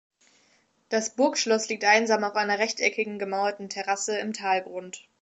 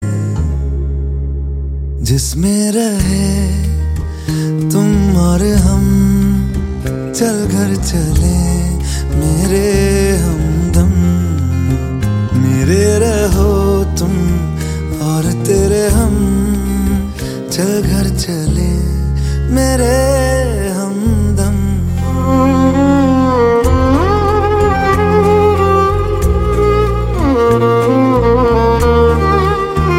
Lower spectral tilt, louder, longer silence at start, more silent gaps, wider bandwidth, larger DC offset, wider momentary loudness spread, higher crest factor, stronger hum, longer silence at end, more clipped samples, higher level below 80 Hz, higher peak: second, -2 dB/octave vs -6.5 dB/octave; second, -25 LUFS vs -13 LUFS; first, 0.9 s vs 0 s; neither; second, 8.2 kHz vs 16 kHz; neither; about the same, 9 LU vs 7 LU; first, 20 dB vs 12 dB; neither; first, 0.2 s vs 0 s; neither; second, -82 dBFS vs -18 dBFS; second, -8 dBFS vs 0 dBFS